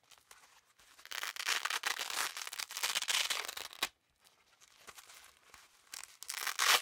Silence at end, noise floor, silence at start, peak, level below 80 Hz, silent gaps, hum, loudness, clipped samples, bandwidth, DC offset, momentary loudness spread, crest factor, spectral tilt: 0 s; -70 dBFS; 0.1 s; -10 dBFS; -82 dBFS; none; none; -36 LUFS; under 0.1%; 19 kHz; under 0.1%; 23 LU; 28 dB; 3 dB/octave